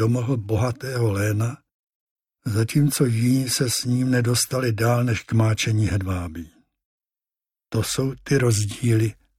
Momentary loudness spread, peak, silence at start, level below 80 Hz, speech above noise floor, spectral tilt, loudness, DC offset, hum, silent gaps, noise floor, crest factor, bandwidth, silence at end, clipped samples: 8 LU; -6 dBFS; 0 s; -48 dBFS; over 69 dB; -5.5 dB/octave; -22 LUFS; under 0.1%; none; 1.74-2.16 s, 6.85-6.98 s; under -90 dBFS; 16 dB; 16 kHz; 0.25 s; under 0.1%